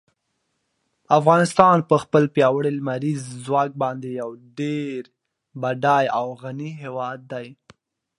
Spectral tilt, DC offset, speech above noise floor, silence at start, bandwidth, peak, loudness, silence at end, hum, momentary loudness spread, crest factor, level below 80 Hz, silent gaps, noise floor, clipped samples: -6.5 dB/octave; under 0.1%; 53 dB; 1.1 s; 11.5 kHz; 0 dBFS; -21 LUFS; 0.65 s; none; 16 LU; 22 dB; -64 dBFS; none; -74 dBFS; under 0.1%